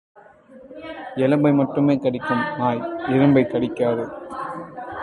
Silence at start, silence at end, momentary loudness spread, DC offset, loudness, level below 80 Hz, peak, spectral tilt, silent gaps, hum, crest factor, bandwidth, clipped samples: 0.15 s; 0 s; 16 LU; under 0.1%; -21 LUFS; -56 dBFS; -4 dBFS; -9 dB/octave; none; none; 18 dB; 10.5 kHz; under 0.1%